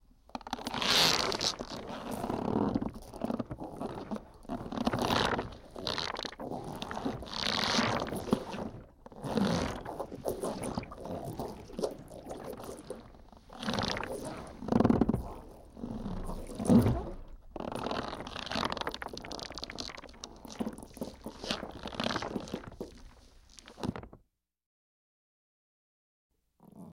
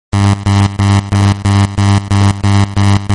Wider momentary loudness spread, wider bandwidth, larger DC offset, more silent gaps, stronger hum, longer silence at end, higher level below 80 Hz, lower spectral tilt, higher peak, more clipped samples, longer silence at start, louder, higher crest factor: first, 18 LU vs 1 LU; first, 16 kHz vs 11.5 kHz; second, under 0.1% vs 0.5%; first, 24.66-26.30 s vs none; neither; about the same, 0 s vs 0 s; second, -50 dBFS vs -32 dBFS; second, -4.5 dB/octave vs -6 dB/octave; second, -12 dBFS vs 0 dBFS; neither; first, 0.35 s vs 0.15 s; second, -34 LUFS vs -11 LUFS; first, 24 dB vs 10 dB